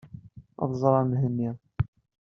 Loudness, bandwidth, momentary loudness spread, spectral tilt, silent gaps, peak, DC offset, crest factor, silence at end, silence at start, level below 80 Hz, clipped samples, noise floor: -27 LUFS; 6.4 kHz; 14 LU; -10.5 dB/octave; none; -6 dBFS; under 0.1%; 22 dB; 0.35 s; 0.05 s; -52 dBFS; under 0.1%; -47 dBFS